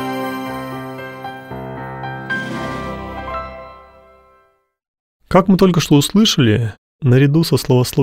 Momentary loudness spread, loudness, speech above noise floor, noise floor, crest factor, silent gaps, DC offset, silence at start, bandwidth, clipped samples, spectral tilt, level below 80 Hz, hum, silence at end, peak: 17 LU; -16 LUFS; 46 dB; -58 dBFS; 16 dB; 4.88-5.20 s, 6.78-6.99 s; under 0.1%; 0 s; 16 kHz; under 0.1%; -5.5 dB/octave; -42 dBFS; none; 0 s; 0 dBFS